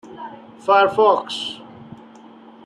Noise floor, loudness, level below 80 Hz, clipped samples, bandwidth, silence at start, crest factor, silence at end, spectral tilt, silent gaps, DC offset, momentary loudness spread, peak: -44 dBFS; -18 LUFS; -68 dBFS; under 0.1%; 11.5 kHz; 0.05 s; 18 dB; 0.7 s; -4 dB/octave; none; under 0.1%; 22 LU; -2 dBFS